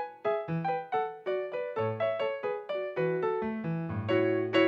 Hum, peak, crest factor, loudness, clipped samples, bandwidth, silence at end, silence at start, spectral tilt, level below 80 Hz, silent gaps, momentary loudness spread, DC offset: none; -14 dBFS; 16 dB; -32 LUFS; under 0.1%; 7.6 kHz; 0 s; 0 s; -8 dB/octave; -70 dBFS; none; 6 LU; under 0.1%